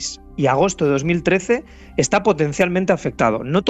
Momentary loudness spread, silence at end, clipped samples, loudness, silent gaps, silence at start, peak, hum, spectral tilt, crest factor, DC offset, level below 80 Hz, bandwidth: 5 LU; 0 s; under 0.1%; -19 LUFS; none; 0 s; -4 dBFS; none; -5 dB/octave; 14 dB; under 0.1%; -44 dBFS; 13 kHz